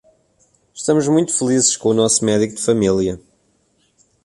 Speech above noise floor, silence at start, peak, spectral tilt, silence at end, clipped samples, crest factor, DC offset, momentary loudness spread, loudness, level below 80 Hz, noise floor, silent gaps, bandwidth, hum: 45 dB; 0.75 s; -2 dBFS; -4 dB/octave; 1.05 s; under 0.1%; 16 dB; under 0.1%; 7 LU; -16 LUFS; -50 dBFS; -61 dBFS; none; 11.5 kHz; none